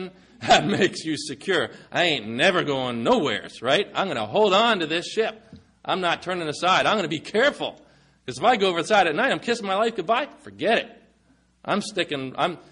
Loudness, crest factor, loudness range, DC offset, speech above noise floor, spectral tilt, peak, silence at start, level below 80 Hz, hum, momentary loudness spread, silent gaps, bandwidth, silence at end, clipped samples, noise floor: -23 LUFS; 18 dB; 2 LU; under 0.1%; 38 dB; -4 dB/octave; -6 dBFS; 0 s; -60 dBFS; none; 10 LU; none; 10.5 kHz; 0.1 s; under 0.1%; -61 dBFS